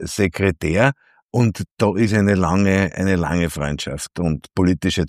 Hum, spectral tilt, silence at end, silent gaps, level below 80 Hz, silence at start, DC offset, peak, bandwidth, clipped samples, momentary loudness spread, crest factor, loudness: none; -6 dB/octave; 0 s; 1.24-1.29 s, 1.71-1.75 s; -38 dBFS; 0 s; under 0.1%; -2 dBFS; 14.5 kHz; under 0.1%; 8 LU; 18 dB; -19 LUFS